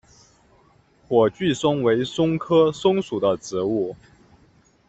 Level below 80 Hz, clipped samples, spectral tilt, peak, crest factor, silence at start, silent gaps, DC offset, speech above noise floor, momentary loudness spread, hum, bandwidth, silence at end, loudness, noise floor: -58 dBFS; under 0.1%; -6 dB/octave; -4 dBFS; 18 dB; 1.1 s; none; under 0.1%; 37 dB; 6 LU; none; 8.2 kHz; 0.95 s; -21 LUFS; -57 dBFS